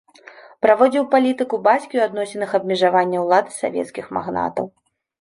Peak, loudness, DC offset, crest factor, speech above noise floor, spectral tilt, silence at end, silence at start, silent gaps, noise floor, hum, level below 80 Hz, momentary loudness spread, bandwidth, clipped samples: -2 dBFS; -19 LUFS; under 0.1%; 18 dB; 26 dB; -5 dB/octave; 0.55 s; 0.65 s; none; -44 dBFS; none; -62 dBFS; 11 LU; 11.5 kHz; under 0.1%